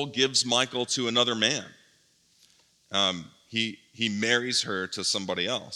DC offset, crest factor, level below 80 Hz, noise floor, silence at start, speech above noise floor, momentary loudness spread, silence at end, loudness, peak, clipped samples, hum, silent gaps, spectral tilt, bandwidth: under 0.1%; 22 dB; -78 dBFS; -64 dBFS; 0 s; 37 dB; 8 LU; 0 s; -26 LUFS; -8 dBFS; under 0.1%; none; none; -2 dB/octave; 14.5 kHz